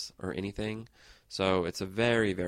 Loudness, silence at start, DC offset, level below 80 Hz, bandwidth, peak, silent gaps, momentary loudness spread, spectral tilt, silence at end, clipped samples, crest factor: -31 LUFS; 0 s; under 0.1%; -56 dBFS; 15.5 kHz; -14 dBFS; none; 11 LU; -5 dB/octave; 0 s; under 0.1%; 18 dB